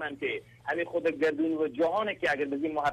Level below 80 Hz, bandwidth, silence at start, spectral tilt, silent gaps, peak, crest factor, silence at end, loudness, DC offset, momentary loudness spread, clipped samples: -66 dBFS; 11 kHz; 0 s; -5.5 dB/octave; none; -16 dBFS; 14 dB; 0 s; -30 LUFS; under 0.1%; 6 LU; under 0.1%